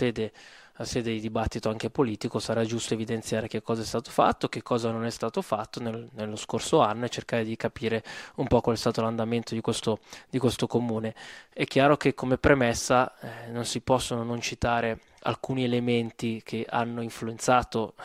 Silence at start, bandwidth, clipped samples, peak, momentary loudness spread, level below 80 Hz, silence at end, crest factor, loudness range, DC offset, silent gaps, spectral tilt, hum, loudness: 0 s; 15.5 kHz; under 0.1%; -4 dBFS; 11 LU; -50 dBFS; 0 s; 24 dB; 4 LU; under 0.1%; none; -5 dB/octave; none; -28 LUFS